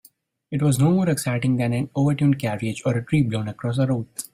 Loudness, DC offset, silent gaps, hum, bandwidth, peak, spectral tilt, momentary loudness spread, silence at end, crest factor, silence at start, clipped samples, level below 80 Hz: -22 LUFS; under 0.1%; none; none; 16 kHz; -8 dBFS; -6.5 dB/octave; 7 LU; 0.1 s; 14 dB; 0.5 s; under 0.1%; -54 dBFS